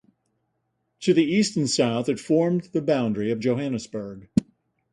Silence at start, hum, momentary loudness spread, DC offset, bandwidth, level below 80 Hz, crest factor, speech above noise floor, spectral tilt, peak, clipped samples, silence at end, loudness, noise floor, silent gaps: 1 s; none; 8 LU; under 0.1%; 11.5 kHz; -58 dBFS; 20 dB; 52 dB; -5.5 dB/octave; -4 dBFS; under 0.1%; 0.5 s; -24 LUFS; -75 dBFS; none